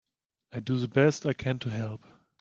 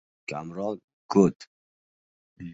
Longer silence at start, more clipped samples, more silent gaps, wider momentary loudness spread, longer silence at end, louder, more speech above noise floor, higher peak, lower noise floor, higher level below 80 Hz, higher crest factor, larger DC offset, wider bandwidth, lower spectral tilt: first, 0.55 s vs 0.3 s; neither; second, none vs 0.84-1.09 s, 1.36-1.40 s, 1.47-2.36 s; about the same, 15 LU vs 17 LU; first, 0.45 s vs 0 s; about the same, -29 LUFS vs -27 LUFS; second, 42 dB vs over 65 dB; second, -10 dBFS vs -6 dBFS; second, -70 dBFS vs under -90 dBFS; about the same, -64 dBFS vs -62 dBFS; about the same, 20 dB vs 22 dB; neither; about the same, 7.6 kHz vs 8 kHz; about the same, -6.5 dB/octave vs -7.5 dB/octave